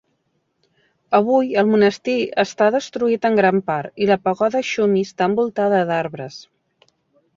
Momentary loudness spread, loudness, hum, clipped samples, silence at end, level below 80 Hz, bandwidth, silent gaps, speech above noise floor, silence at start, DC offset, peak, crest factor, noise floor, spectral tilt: 7 LU; -18 LUFS; none; under 0.1%; 0.95 s; -64 dBFS; 7.6 kHz; none; 51 dB; 1.1 s; under 0.1%; -2 dBFS; 16 dB; -69 dBFS; -6 dB/octave